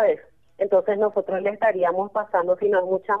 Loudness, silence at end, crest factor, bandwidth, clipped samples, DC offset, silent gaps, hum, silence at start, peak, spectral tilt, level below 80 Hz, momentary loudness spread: -23 LUFS; 0 s; 14 dB; 3.8 kHz; under 0.1%; 0.1%; none; none; 0 s; -8 dBFS; -8 dB/octave; -70 dBFS; 5 LU